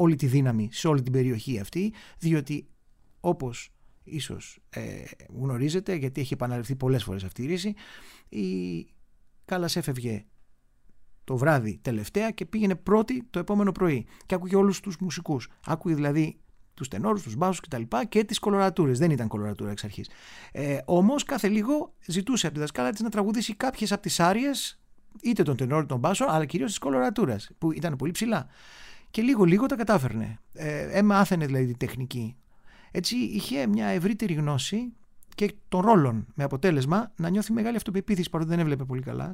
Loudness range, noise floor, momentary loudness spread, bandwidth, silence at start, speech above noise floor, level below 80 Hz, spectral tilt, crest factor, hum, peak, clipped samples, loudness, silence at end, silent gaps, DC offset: 6 LU; -57 dBFS; 12 LU; 16 kHz; 0 s; 31 dB; -54 dBFS; -6 dB/octave; 20 dB; none; -6 dBFS; under 0.1%; -27 LUFS; 0 s; none; under 0.1%